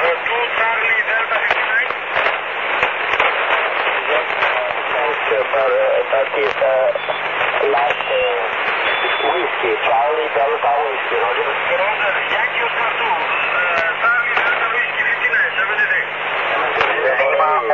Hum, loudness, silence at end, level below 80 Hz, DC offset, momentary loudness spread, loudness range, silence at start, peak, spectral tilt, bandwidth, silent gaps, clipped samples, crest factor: 50 Hz at -65 dBFS; -16 LUFS; 0 s; -58 dBFS; 0.2%; 3 LU; 1 LU; 0 s; -2 dBFS; -3.5 dB/octave; 7.2 kHz; none; under 0.1%; 16 dB